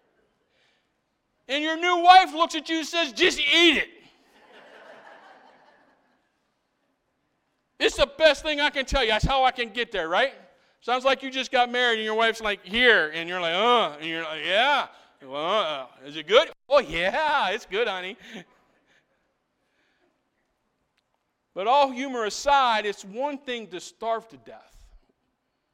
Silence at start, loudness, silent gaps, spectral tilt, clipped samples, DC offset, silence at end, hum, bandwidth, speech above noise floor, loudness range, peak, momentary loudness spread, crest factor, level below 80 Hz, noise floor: 1.5 s; -23 LUFS; none; -3 dB/octave; under 0.1%; under 0.1%; 1.15 s; none; 15 kHz; 52 dB; 9 LU; -2 dBFS; 15 LU; 24 dB; -48 dBFS; -75 dBFS